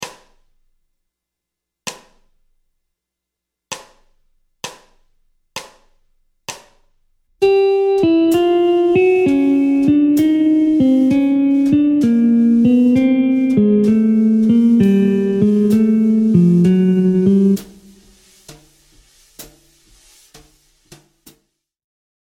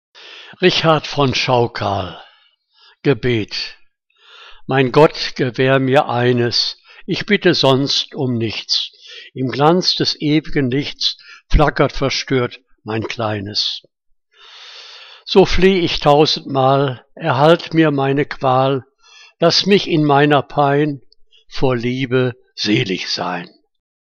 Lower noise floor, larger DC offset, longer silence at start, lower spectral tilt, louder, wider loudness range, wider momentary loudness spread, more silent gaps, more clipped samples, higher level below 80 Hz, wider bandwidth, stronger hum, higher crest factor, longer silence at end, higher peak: first, -82 dBFS vs -55 dBFS; neither; second, 0 s vs 0.2 s; first, -7.5 dB/octave vs -5.5 dB/octave; first, -13 LUFS vs -16 LUFS; first, 23 LU vs 5 LU; first, 20 LU vs 13 LU; neither; neither; second, -52 dBFS vs -34 dBFS; first, 16 kHz vs 8.6 kHz; neither; about the same, 14 dB vs 16 dB; first, 2.8 s vs 0.7 s; about the same, -2 dBFS vs 0 dBFS